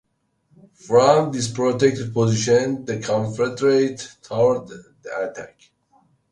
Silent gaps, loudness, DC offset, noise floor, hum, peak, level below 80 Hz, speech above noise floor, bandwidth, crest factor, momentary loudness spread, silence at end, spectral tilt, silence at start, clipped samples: none; -20 LUFS; under 0.1%; -67 dBFS; none; 0 dBFS; -58 dBFS; 47 dB; 11.5 kHz; 20 dB; 14 LU; 0.85 s; -5.5 dB/octave; 0.85 s; under 0.1%